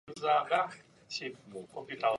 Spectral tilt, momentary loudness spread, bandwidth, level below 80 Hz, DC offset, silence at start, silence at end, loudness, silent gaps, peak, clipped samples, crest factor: -3.5 dB/octave; 18 LU; 11.5 kHz; -78 dBFS; under 0.1%; 0.05 s; 0 s; -33 LUFS; none; -16 dBFS; under 0.1%; 18 dB